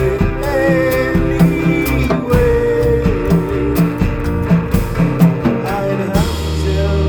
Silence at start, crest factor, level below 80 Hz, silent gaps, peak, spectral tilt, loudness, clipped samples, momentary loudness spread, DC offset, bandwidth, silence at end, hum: 0 s; 14 dB; -22 dBFS; none; 0 dBFS; -7.5 dB/octave; -15 LUFS; under 0.1%; 5 LU; under 0.1%; over 20 kHz; 0 s; none